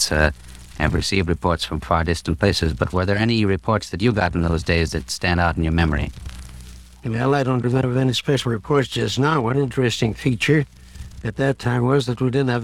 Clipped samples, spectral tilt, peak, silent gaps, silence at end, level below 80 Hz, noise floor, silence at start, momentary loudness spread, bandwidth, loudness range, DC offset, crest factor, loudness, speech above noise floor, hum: under 0.1%; -5.5 dB/octave; 0 dBFS; none; 0 s; -34 dBFS; -40 dBFS; 0 s; 11 LU; 15 kHz; 2 LU; 0.2%; 20 dB; -20 LUFS; 20 dB; none